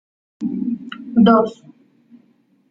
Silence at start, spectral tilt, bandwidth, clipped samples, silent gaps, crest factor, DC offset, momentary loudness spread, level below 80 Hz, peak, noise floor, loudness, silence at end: 0.4 s; -8.5 dB/octave; 7.2 kHz; under 0.1%; none; 18 dB; under 0.1%; 15 LU; -60 dBFS; -2 dBFS; -58 dBFS; -18 LUFS; 1.2 s